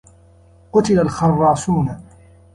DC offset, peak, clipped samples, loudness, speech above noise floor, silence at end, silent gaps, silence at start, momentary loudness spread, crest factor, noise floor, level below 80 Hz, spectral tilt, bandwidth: under 0.1%; -4 dBFS; under 0.1%; -17 LUFS; 33 dB; 0.55 s; none; 0.75 s; 8 LU; 16 dB; -48 dBFS; -44 dBFS; -7 dB/octave; 11.5 kHz